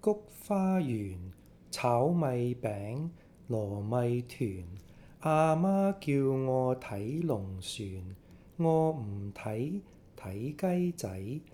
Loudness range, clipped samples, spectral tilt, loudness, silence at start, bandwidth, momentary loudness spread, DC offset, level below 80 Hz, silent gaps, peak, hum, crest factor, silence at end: 4 LU; under 0.1%; -7.5 dB/octave; -32 LUFS; 0.05 s; 16.5 kHz; 15 LU; under 0.1%; -62 dBFS; none; -14 dBFS; none; 18 dB; 0.1 s